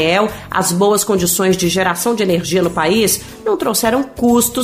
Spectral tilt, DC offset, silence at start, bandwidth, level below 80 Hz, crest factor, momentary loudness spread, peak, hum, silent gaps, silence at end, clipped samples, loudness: -3.5 dB/octave; under 0.1%; 0 s; 15.5 kHz; -42 dBFS; 12 dB; 4 LU; -2 dBFS; none; none; 0 s; under 0.1%; -15 LUFS